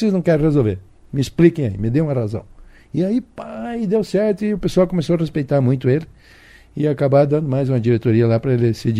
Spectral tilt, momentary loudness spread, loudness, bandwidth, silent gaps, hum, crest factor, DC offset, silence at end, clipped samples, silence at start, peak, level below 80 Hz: -8.5 dB/octave; 11 LU; -18 LUFS; 12.5 kHz; none; none; 18 dB; under 0.1%; 0 s; under 0.1%; 0 s; 0 dBFS; -42 dBFS